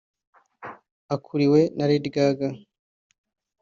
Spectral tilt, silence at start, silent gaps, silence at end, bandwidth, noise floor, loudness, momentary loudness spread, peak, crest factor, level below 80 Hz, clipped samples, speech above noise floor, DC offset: -6.5 dB/octave; 0.6 s; 0.91-1.09 s; 1.05 s; 7.2 kHz; -43 dBFS; -23 LUFS; 22 LU; -8 dBFS; 18 dB; -66 dBFS; under 0.1%; 21 dB; under 0.1%